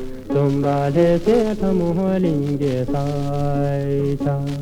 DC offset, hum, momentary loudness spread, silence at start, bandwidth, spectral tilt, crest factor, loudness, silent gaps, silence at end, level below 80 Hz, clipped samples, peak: under 0.1%; none; 6 LU; 0 s; 12.5 kHz; -8.5 dB/octave; 14 dB; -20 LUFS; none; 0 s; -36 dBFS; under 0.1%; -4 dBFS